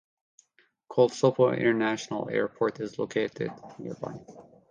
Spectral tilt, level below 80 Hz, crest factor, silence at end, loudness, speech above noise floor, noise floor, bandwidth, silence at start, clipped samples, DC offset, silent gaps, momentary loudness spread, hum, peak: -6 dB/octave; -70 dBFS; 20 dB; 0.3 s; -28 LUFS; 40 dB; -67 dBFS; 9.4 kHz; 0.9 s; under 0.1%; under 0.1%; none; 16 LU; none; -8 dBFS